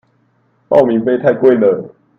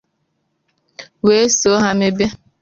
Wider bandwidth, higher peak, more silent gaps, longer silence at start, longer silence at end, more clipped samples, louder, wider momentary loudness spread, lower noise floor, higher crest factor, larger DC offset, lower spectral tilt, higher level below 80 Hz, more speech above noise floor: second, 5.6 kHz vs 7.6 kHz; about the same, 0 dBFS vs -2 dBFS; neither; second, 0.7 s vs 1 s; about the same, 0.3 s vs 0.25 s; neither; about the same, -13 LUFS vs -15 LUFS; second, 4 LU vs 7 LU; second, -57 dBFS vs -68 dBFS; about the same, 14 dB vs 16 dB; neither; first, -9 dB/octave vs -3.5 dB/octave; second, -58 dBFS vs -50 dBFS; second, 46 dB vs 54 dB